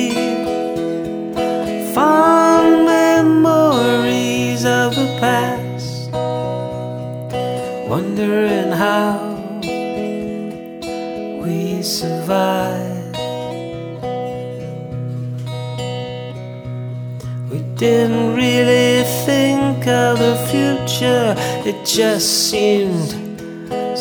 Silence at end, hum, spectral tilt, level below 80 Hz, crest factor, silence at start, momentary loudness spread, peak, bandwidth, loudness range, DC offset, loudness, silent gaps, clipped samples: 0 s; none; -5 dB/octave; -50 dBFS; 16 dB; 0 s; 15 LU; 0 dBFS; over 20 kHz; 12 LU; under 0.1%; -17 LUFS; none; under 0.1%